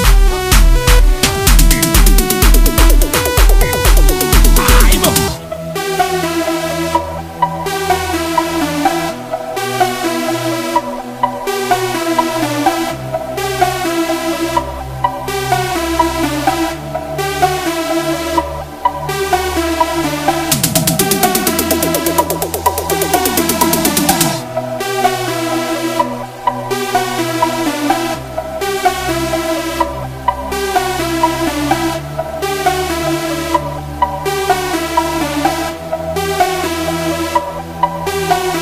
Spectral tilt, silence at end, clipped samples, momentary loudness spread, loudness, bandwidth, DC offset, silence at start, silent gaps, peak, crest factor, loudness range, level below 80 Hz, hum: -4 dB/octave; 0 s; under 0.1%; 8 LU; -15 LUFS; 16 kHz; under 0.1%; 0 s; none; 0 dBFS; 14 dB; 6 LU; -18 dBFS; none